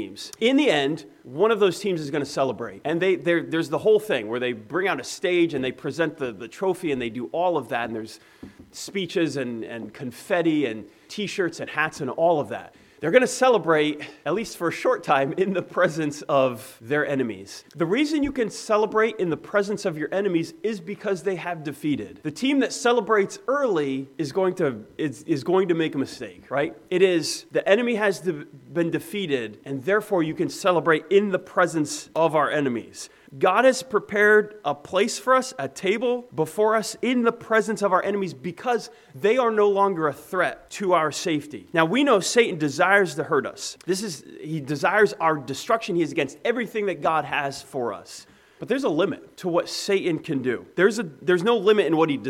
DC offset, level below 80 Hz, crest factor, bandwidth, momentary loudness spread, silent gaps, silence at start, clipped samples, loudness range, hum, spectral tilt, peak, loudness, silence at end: under 0.1%; -64 dBFS; 20 dB; 16 kHz; 11 LU; none; 0 s; under 0.1%; 5 LU; none; -4.5 dB/octave; -2 dBFS; -23 LUFS; 0 s